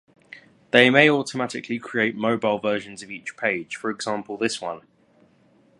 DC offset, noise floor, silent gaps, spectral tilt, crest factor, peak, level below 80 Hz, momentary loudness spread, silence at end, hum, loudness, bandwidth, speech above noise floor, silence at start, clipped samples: under 0.1%; -59 dBFS; none; -4.5 dB/octave; 24 dB; 0 dBFS; -70 dBFS; 17 LU; 1 s; none; -22 LUFS; 11.5 kHz; 36 dB; 0.75 s; under 0.1%